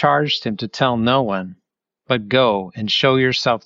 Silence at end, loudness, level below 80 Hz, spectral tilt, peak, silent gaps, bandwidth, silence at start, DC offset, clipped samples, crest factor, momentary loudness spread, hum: 0.1 s; -18 LUFS; -56 dBFS; -5.5 dB/octave; -2 dBFS; none; 7.6 kHz; 0 s; under 0.1%; under 0.1%; 16 dB; 8 LU; none